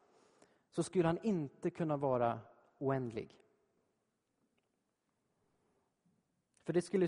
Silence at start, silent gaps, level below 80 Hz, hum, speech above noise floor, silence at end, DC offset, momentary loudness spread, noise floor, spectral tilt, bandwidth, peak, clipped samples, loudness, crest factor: 0.75 s; none; -74 dBFS; none; 48 dB; 0 s; under 0.1%; 12 LU; -84 dBFS; -7 dB/octave; 10.5 kHz; -18 dBFS; under 0.1%; -38 LUFS; 20 dB